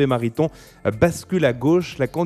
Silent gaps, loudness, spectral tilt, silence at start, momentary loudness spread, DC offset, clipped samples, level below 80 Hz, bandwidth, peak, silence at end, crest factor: none; -21 LUFS; -6.5 dB/octave; 0 s; 6 LU; under 0.1%; under 0.1%; -46 dBFS; 14 kHz; -2 dBFS; 0 s; 18 dB